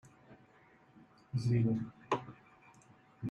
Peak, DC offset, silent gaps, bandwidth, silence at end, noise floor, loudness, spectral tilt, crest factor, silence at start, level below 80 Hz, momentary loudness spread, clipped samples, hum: -20 dBFS; under 0.1%; none; 8.6 kHz; 0 s; -64 dBFS; -36 LUFS; -8 dB/octave; 20 dB; 0.3 s; -70 dBFS; 19 LU; under 0.1%; none